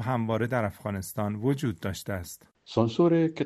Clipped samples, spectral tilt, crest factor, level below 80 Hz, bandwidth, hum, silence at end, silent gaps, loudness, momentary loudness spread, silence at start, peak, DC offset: under 0.1%; -6.5 dB/octave; 20 dB; -58 dBFS; 13.5 kHz; none; 0 s; none; -28 LUFS; 12 LU; 0 s; -8 dBFS; under 0.1%